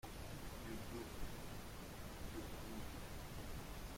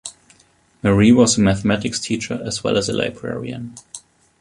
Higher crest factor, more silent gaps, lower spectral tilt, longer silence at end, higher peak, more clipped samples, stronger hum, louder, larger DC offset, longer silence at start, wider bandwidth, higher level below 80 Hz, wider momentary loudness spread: about the same, 14 dB vs 18 dB; neither; about the same, -4.5 dB/octave vs -5 dB/octave; second, 0 s vs 0.4 s; second, -34 dBFS vs -2 dBFS; neither; neither; second, -51 LUFS vs -18 LUFS; neither; about the same, 0.05 s vs 0.05 s; first, 16.5 kHz vs 11.5 kHz; second, -54 dBFS vs -44 dBFS; second, 3 LU vs 22 LU